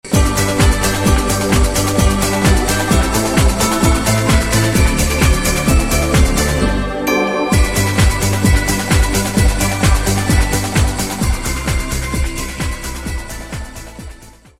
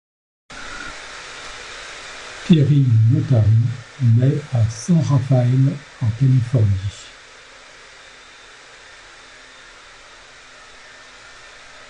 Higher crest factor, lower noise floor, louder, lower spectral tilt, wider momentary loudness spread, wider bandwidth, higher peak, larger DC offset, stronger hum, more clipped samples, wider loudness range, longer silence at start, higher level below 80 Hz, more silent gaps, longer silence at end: about the same, 14 dB vs 18 dB; second, -38 dBFS vs -43 dBFS; about the same, -15 LUFS vs -17 LUFS; second, -4.5 dB/octave vs -7.5 dB/octave; second, 9 LU vs 26 LU; first, 16.5 kHz vs 9.8 kHz; about the same, 0 dBFS vs -2 dBFS; neither; neither; neither; about the same, 5 LU vs 7 LU; second, 0.05 s vs 0.5 s; first, -18 dBFS vs -44 dBFS; neither; second, 0.3 s vs 4.8 s